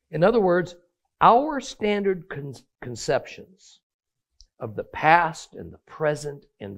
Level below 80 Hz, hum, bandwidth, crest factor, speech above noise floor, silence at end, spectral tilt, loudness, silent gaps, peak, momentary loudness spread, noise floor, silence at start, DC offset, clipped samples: -56 dBFS; none; 14 kHz; 24 dB; 35 dB; 0 s; -5.5 dB/octave; -22 LUFS; 3.83-3.99 s; -2 dBFS; 22 LU; -59 dBFS; 0.1 s; under 0.1%; under 0.1%